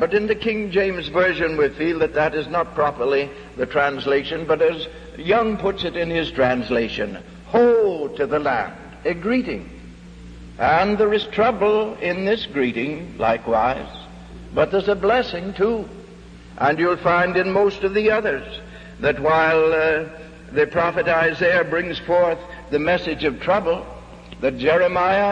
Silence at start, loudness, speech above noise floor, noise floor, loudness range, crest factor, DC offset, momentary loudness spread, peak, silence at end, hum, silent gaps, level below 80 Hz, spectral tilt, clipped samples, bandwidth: 0 s; -20 LUFS; 21 dB; -41 dBFS; 3 LU; 16 dB; under 0.1%; 12 LU; -6 dBFS; 0 s; none; none; -44 dBFS; -6.5 dB/octave; under 0.1%; 9 kHz